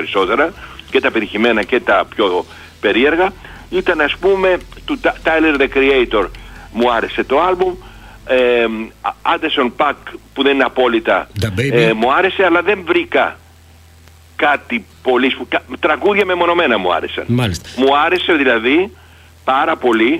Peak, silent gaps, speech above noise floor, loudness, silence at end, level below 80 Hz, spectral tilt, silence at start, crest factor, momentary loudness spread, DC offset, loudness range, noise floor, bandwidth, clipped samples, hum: 0 dBFS; none; 29 dB; -15 LUFS; 0 s; -40 dBFS; -5.5 dB/octave; 0 s; 14 dB; 8 LU; under 0.1%; 2 LU; -43 dBFS; 15 kHz; under 0.1%; none